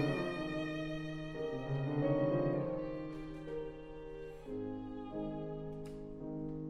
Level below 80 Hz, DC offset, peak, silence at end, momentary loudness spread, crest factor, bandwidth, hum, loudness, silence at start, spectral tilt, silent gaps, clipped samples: -56 dBFS; under 0.1%; -22 dBFS; 0 s; 13 LU; 16 dB; 10.5 kHz; none; -40 LUFS; 0 s; -8 dB/octave; none; under 0.1%